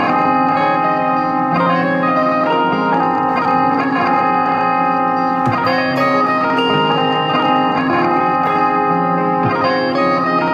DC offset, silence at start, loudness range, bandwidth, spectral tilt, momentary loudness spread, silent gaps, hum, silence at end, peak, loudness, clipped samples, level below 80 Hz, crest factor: under 0.1%; 0 s; 0 LU; 7.6 kHz; -7 dB/octave; 2 LU; none; none; 0 s; -2 dBFS; -15 LUFS; under 0.1%; -56 dBFS; 12 dB